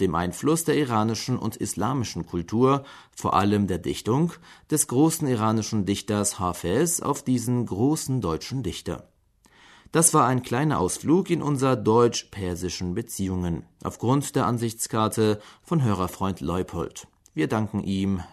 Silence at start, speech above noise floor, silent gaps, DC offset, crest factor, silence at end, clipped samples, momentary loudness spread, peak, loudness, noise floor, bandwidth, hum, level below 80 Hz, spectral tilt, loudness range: 0 s; 35 dB; none; under 0.1%; 18 dB; 0.05 s; under 0.1%; 9 LU; -6 dBFS; -25 LUFS; -59 dBFS; 13.5 kHz; none; -52 dBFS; -5 dB/octave; 4 LU